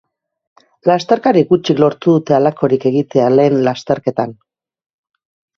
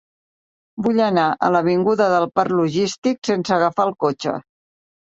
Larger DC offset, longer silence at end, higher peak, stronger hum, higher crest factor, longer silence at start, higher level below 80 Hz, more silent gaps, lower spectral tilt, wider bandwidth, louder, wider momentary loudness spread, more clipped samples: neither; first, 1.25 s vs 0.75 s; about the same, 0 dBFS vs -2 dBFS; neither; about the same, 14 dB vs 16 dB; about the same, 0.85 s vs 0.75 s; first, -56 dBFS vs -62 dBFS; second, none vs 2.98-3.02 s, 3.18-3.22 s; first, -7.5 dB/octave vs -6 dB/octave; second, 7.2 kHz vs 8.2 kHz; first, -14 LUFS vs -19 LUFS; about the same, 7 LU vs 8 LU; neither